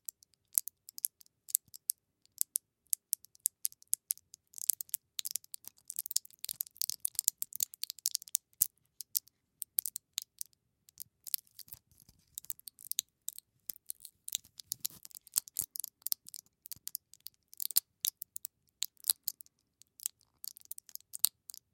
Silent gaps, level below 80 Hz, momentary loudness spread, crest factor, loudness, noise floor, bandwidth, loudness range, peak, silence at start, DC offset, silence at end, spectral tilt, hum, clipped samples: none; -84 dBFS; 16 LU; 40 dB; -36 LUFS; -70 dBFS; 17 kHz; 7 LU; 0 dBFS; 0.55 s; under 0.1%; 0.45 s; 3 dB/octave; none; under 0.1%